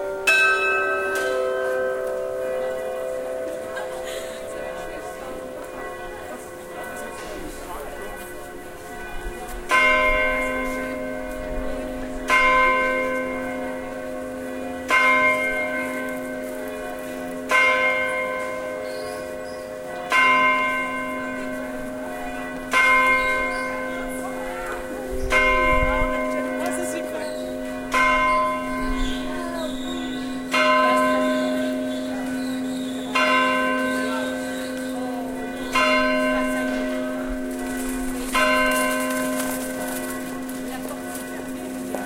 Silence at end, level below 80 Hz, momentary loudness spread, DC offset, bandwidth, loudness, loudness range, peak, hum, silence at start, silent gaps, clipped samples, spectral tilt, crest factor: 0 s; -40 dBFS; 16 LU; under 0.1%; 17 kHz; -23 LUFS; 10 LU; -4 dBFS; none; 0 s; none; under 0.1%; -3.5 dB/octave; 18 dB